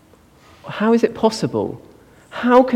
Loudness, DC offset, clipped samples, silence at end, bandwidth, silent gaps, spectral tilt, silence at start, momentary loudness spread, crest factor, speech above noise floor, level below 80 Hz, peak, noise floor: -18 LUFS; under 0.1%; under 0.1%; 0 s; 13 kHz; none; -6 dB/octave; 0.65 s; 20 LU; 18 dB; 33 dB; -56 dBFS; 0 dBFS; -50 dBFS